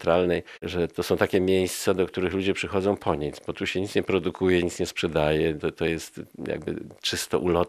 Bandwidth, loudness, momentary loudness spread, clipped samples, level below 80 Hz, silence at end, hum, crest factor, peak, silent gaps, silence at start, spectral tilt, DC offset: 14.5 kHz; -26 LUFS; 9 LU; under 0.1%; -50 dBFS; 0 s; none; 20 dB; -6 dBFS; none; 0 s; -5 dB/octave; under 0.1%